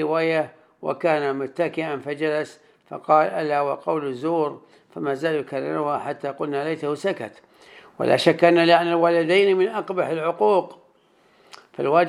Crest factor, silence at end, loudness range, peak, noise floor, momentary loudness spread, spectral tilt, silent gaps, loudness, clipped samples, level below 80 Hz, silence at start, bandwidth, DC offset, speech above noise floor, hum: 20 dB; 0 s; 7 LU; -2 dBFS; -59 dBFS; 13 LU; -6 dB/octave; none; -22 LUFS; under 0.1%; -78 dBFS; 0 s; 12.5 kHz; under 0.1%; 38 dB; none